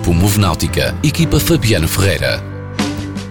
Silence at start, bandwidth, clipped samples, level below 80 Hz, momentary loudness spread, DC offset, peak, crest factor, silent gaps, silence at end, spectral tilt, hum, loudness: 0 s; 19.5 kHz; under 0.1%; -28 dBFS; 8 LU; under 0.1%; -4 dBFS; 12 dB; none; 0 s; -5 dB/octave; none; -15 LUFS